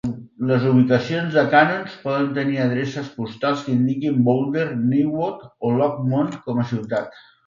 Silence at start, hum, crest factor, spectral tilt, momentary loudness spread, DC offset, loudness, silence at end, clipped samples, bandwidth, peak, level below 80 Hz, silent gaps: 0.05 s; none; 18 dB; -8 dB/octave; 11 LU; under 0.1%; -21 LUFS; 0.35 s; under 0.1%; 7.4 kHz; -2 dBFS; -60 dBFS; none